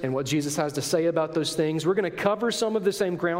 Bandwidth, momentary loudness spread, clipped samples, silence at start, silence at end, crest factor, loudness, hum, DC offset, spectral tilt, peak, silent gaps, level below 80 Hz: 16 kHz; 2 LU; under 0.1%; 0 s; 0 s; 18 dB; -25 LUFS; none; under 0.1%; -4.5 dB/octave; -8 dBFS; none; -64 dBFS